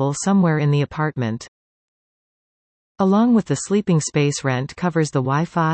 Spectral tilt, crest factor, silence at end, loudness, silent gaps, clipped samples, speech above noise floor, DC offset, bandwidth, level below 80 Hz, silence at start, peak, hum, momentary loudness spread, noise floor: -6 dB/octave; 14 dB; 0 s; -19 LUFS; 1.48-2.95 s; under 0.1%; over 71 dB; under 0.1%; 8.8 kHz; -58 dBFS; 0 s; -6 dBFS; none; 6 LU; under -90 dBFS